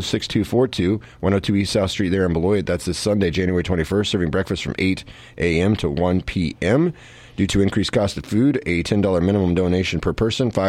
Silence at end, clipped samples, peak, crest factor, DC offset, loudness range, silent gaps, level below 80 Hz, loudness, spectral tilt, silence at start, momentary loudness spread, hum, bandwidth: 0 s; under 0.1%; -4 dBFS; 16 dB; under 0.1%; 2 LU; none; -38 dBFS; -20 LUFS; -6 dB/octave; 0 s; 4 LU; none; 14 kHz